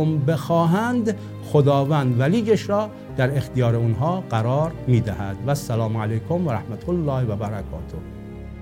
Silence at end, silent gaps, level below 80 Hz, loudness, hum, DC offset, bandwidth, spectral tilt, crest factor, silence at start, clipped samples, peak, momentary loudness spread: 0 s; none; -44 dBFS; -22 LUFS; none; under 0.1%; 16.5 kHz; -7.5 dB/octave; 16 dB; 0 s; under 0.1%; -4 dBFS; 12 LU